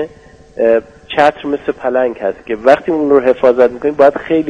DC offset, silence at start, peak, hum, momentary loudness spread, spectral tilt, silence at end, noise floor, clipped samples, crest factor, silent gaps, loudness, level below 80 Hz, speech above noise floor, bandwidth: under 0.1%; 0 s; 0 dBFS; none; 9 LU; -6.5 dB/octave; 0 s; -40 dBFS; 0.1%; 12 dB; none; -13 LUFS; -48 dBFS; 28 dB; 9 kHz